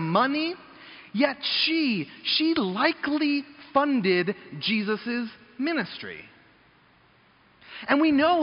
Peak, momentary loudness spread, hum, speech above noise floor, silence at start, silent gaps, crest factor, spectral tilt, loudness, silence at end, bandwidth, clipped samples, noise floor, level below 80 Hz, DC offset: -6 dBFS; 15 LU; none; 35 dB; 0 s; none; 20 dB; -2.5 dB/octave; -25 LUFS; 0 s; 5.4 kHz; under 0.1%; -59 dBFS; -68 dBFS; under 0.1%